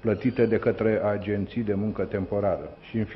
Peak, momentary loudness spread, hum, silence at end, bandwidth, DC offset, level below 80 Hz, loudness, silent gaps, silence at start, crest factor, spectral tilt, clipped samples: -10 dBFS; 7 LU; none; 0 s; 5.8 kHz; under 0.1%; -52 dBFS; -26 LUFS; none; 0.05 s; 16 dB; -10.5 dB/octave; under 0.1%